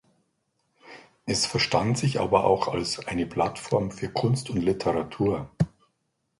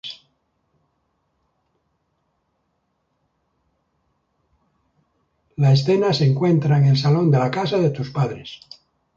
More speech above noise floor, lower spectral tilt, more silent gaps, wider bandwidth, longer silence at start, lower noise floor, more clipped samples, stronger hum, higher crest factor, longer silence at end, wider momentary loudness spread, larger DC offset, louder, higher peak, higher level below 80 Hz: about the same, 50 dB vs 53 dB; second, -5 dB/octave vs -7.5 dB/octave; neither; first, 11.5 kHz vs 7.4 kHz; first, 0.85 s vs 0.05 s; first, -76 dBFS vs -71 dBFS; neither; neither; first, 22 dB vs 16 dB; about the same, 0.7 s vs 0.6 s; second, 7 LU vs 20 LU; neither; second, -26 LUFS vs -18 LUFS; about the same, -6 dBFS vs -6 dBFS; first, -52 dBFS vs -60 dBFS